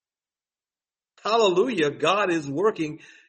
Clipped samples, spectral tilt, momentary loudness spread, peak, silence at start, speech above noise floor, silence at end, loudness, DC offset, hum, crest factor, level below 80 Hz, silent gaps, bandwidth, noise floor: under 0.1%; -4.5 dB/octave; 11 LU; -8 dBFS; 1.25 s; over 67 dB; 0.3 s; -23 LUFS; under 0.1%; none; 18 dB; -70 dBFS; none; 8.8 kHz; under -90 dBFS